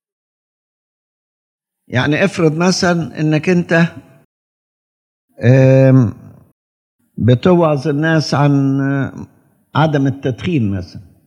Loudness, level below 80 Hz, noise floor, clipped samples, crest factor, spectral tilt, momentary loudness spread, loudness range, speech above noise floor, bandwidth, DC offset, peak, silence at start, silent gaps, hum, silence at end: -14 LUFS; -56 dBFS; under -90 dBFS; under 0.1%; 16 dB; -7 dB/octave; 11 LU; 3 LU; over 77 dB; 9.8 kHz; under 0.1%; 0 dBFS; 1.9 s; 4.25-5.28 s, 6.53-6.99 s; none; 0.25 s